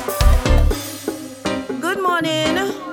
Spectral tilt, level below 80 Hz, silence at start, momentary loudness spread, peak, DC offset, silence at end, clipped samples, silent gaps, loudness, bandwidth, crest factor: -5 dB/octave; -20 dBFS; 0 s; 10 LU; -2 dBFS; under 0.1%; 0 s; under 0.1%; none; -20 LUFS; 18.5 kHz; 16 dB